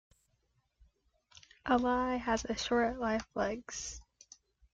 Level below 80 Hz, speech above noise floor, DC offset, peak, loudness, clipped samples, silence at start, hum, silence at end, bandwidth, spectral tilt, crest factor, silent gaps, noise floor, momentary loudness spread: -56 dBFS; 44 dB; under 0.1%; -18 dBFS; -34 LUFS; under 0.1%; 1.65 s; none; 0.7 s; 9 kHz; -3.5 dB/octave; 18 dB; none; -77 dBFS; 12 LU